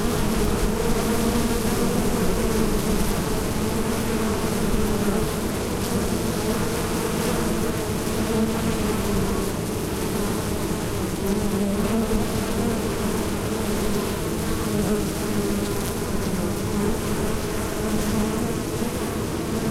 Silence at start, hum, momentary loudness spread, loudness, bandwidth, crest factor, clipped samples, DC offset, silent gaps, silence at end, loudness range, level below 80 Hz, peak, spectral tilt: 0 s; none; 3 LU; -24 LUFS; 16 kHz; 14 dB; under 0.1%; under 0.1%; none; 0 s; 2 LU; -32 dBFS; -8 dBFS; -5 dB/octave